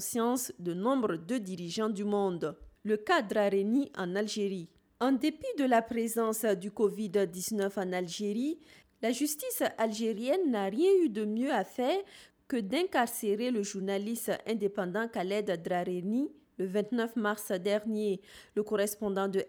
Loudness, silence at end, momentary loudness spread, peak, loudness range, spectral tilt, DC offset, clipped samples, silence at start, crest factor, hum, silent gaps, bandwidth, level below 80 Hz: -32 LUFS; 0 s; 7 LU; -16 dBFS; 3 LU; -4.5 dB/octave; under 0.1%; under 0.1%; 0 s; 16 dB; none; none; over 20 kHz; -70 dBFS